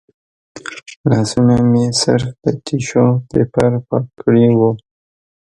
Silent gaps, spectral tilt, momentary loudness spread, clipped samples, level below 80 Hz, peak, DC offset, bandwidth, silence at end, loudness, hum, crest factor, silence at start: 0.96-1.04 s; -6.5 dB/octave; 14 LU; under 0.1%; -46 dBFS; 0 dBFS; under 0.1%; 11.5 kHz; 0.7 s; -15 LUFS; none; 16 dB; 0.55 s